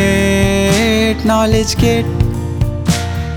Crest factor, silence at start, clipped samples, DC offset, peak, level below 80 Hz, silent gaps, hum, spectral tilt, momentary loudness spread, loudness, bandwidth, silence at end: 12 dB; 0 s; under 0.1%; under 0.1%; 0 dBFS; -24 dBFS; none; none; -5 dB/octave; 5 LU; -14 LUFS; 19.5 kHz; 0 s